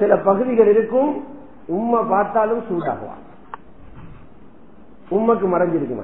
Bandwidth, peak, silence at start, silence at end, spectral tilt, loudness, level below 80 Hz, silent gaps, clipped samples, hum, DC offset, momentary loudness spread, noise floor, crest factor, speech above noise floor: 3.8 kHz; -2 dBFS; 0 s; 0 s; -12 dB/octave; -19 LUFS; -52 dBFS; none; under 0.1%; none; 0.8%; 24 LU; -47 dBFS; 18 dB; 29 dB